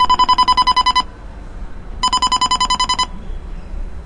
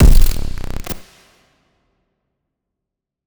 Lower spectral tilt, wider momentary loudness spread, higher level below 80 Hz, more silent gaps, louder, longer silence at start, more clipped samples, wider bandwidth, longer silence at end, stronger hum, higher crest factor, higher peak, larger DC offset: second, -1.5 dB/octave vs -6 dB/octave; first, 23 LU vs 14 LU; second, -30 dBFS vs -16 dBFS; neither; first, -14 LUFS vs -21 LUFS; about the same, 0 s vs 0 s; neither; second, 10.5 kHz vs over 20 kHz; second, 0 s vs 2.3 s; neither; about the same, 14 dB vs 16 dB; about the same, -2 dBFS vs 0 dBFS; neither